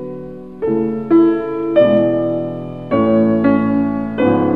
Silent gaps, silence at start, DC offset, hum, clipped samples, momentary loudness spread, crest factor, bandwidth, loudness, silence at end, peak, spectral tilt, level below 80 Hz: none; 0 s; 0.7%; none; under 0.1%; 12 LU; 14 dB; 4.3 kHz; -15 LUFS; 0 s; -2 dBFS; -10 dB/octave; -48 dBFS